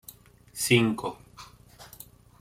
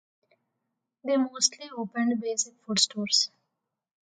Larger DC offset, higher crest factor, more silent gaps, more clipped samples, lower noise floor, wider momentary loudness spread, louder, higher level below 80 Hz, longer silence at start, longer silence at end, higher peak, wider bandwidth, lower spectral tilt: neither; about the same, 22 dB vs 22 dB; neither; neither; second, -52 dBFS vs -84 dBFS; first, 26 LU vs 9 LU; about the same, -25 LUFS vs -26 LUFS; first, -60 dBFS vs -80 dBFS; second, 0.55 s vs 1.05 s; second, 0.55 s vs 0.85 s; about the same, -8 dBFS vs -8 dBFS; first, 16.5 kHz vs 10 kHz; first, -4.5 dB/octave vs -2 dB/octave